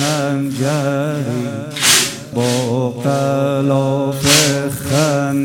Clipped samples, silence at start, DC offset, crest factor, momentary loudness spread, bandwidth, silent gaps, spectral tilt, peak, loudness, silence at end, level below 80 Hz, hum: under 0.1%; 0 s; under 0.1%; 16 dB; 9 LU; 18 kHz; none; -4 dB/octave; 0 dBFS; -15 LUFS; 0 s; -50 dBFS; none